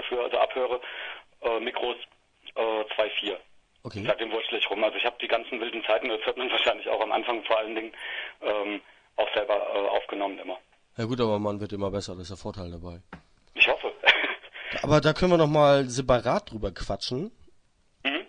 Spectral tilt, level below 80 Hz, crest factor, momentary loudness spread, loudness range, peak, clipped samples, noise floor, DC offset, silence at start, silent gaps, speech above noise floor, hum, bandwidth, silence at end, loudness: -5 dB/octave; -50 dBFS; 24 dB; 17 LU; 8 LU; -2 dBFS; under 0.1%; -62 dBFS; under 0.1%; 0 s; none; 35 dB; none; 10.5 kHz; 0.05 s; -26 LUFS